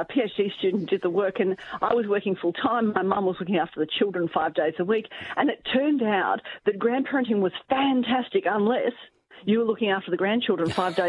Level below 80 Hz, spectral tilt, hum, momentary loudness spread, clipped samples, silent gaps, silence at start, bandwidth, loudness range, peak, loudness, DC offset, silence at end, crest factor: -66 dBFS; -7 dB/octave; none; 4 LU; under 0.1%; none; 0 s; 11 kHz; 1 LU; -8 dBFS; -25 LUFS; under 0.1%; 0 s; 18 dB